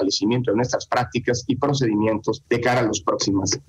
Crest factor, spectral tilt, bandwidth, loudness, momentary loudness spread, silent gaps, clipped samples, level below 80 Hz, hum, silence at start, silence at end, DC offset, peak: 14 dB; -4.5 dB/octave; 12 kHz; -22 LUFS; 3 LU; none; under 0.1%; -54 dBFS; none; 0 s; 0.05 s; under 0.1%; -6 dBFS